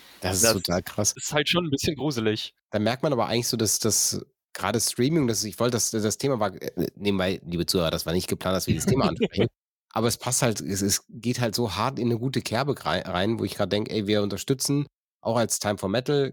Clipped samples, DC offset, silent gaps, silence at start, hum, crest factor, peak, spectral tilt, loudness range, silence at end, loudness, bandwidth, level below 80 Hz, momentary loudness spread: under 0.1%; under 0.1%; 2.63-2.69 s, 9.64-9.87 s, 14.94-15.20 s; 0.2 s; none; 20 dB; -6 dBFS; -4 dB/octave; 2 LU; 0 s; -25 LUFS; 17.5 kHz; -52 dBFS; 5 LU